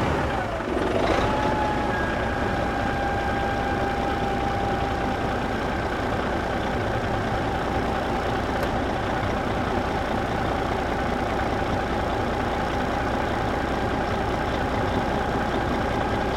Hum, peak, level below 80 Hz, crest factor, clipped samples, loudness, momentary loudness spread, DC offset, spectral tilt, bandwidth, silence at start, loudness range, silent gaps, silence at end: none; -10 dBFS; -34 dBFS; 16 dB; under 0.1%; -25 LUFS; 2 LU; under 0.1%; -6 dB/octave; 16 kHz; 0 s; 1 LU; none; 0 s